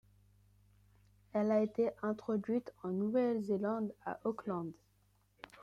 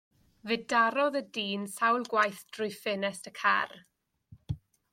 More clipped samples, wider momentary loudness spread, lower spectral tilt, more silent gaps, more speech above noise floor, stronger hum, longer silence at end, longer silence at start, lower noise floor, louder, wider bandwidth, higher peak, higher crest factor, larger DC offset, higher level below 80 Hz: neither; second, 9 LU vs 15 LU; first, -8.5 dB/octave vs -4 dB/octave; neither; first, 37 dB vs 28 dB; first, 50 Hz at -60 dBFS vs none; second, 0 s vs 0.35 s; first, 1.35 s vs 0.45 s; first, -72 dBFS vs -59 dBFS; second, -37 LUFS vs -30 LUFS; second, 7.6 kHz vs 16.5 kHz; second, -22 dBFS vs -12 dBFS; about the same, 16 dB vs 20 dB; neither; second, -74 dBFS vs -62 dBFS